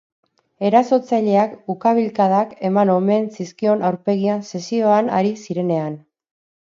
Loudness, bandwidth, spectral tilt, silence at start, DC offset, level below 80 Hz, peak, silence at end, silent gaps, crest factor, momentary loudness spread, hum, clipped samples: -18 LUFS; 7.4 kHz; -7.5 dB/octave; 0.6 s; under 0.1%; -70 dBFS; 0 dBFS; 0.65 s; none; 18 dB; 8 LU; none; under 0.1%